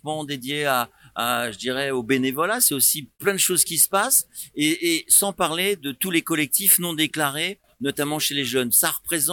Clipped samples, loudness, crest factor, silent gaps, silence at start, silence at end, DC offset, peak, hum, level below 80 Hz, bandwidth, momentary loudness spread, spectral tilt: under 0.1%; -20 LUFS; 20 dB; none; 0.05 s; 0 s; under 0.1%; -4 dBFS; none; -62 dBFS; 19 kHz; 10 LU; -2 dB/octave